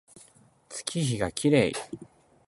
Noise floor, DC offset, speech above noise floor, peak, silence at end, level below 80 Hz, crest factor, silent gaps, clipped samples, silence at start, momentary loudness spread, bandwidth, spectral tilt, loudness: -58 dBFS; under 0.1%; 31 dB; -6 dBFS; 0.45 s; -56 dBFS; 22 dB; none; under 0.1%; 0.15 s; 19 LU; 12 kHz; -5 dB/octave; -27 LUFS